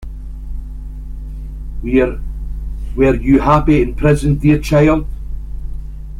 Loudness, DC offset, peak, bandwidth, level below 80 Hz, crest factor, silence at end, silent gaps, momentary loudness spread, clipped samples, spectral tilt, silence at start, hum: -14 LUFS; under 0.1%; 0 dBFS; 14 kHz; -24 dBFS; 16 dB; 0 s; none; 19 LU; under 0.1%; -8 dB/octave; 0 s; none